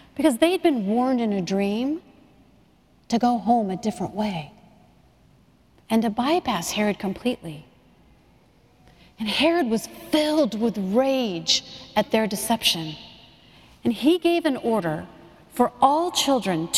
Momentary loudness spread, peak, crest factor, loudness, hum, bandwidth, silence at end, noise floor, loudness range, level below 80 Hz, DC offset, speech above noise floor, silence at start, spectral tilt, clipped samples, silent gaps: 9 LU; -4 dBFS; 20 dB; -23 LUFS; none; 16 kHz; 0 s; -58 dBFS; 4 LU; -58 dBFS; under 0.1%; 35 dB; 0.15 s; -4 dB/octave; under 0.1%; none